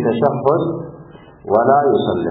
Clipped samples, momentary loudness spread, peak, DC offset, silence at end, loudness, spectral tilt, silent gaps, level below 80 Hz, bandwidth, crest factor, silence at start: under 0.1%; 17 LU; -2 dBFS; under 0.1%; 0 s; -16 LUFS; -11.5 dB/octave; none; -54 dBFS; 4 kHz; 16 dB; 0 s